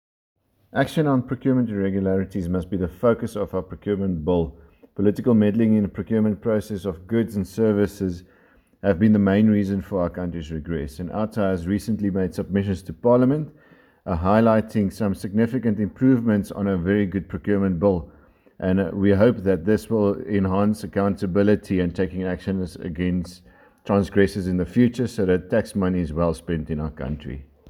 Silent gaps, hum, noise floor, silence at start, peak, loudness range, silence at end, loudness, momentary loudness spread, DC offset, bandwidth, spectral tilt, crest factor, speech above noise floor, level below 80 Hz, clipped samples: none; none; -57 dBFS; 0.75 s; -4 dBFS; 3 LU; 0 s; -22 LUFS; 11 LU; under 0.1%; 14 kHz; -8 dB/octave; 18 dB; 36 dB; -44 dBFS; under 0.1%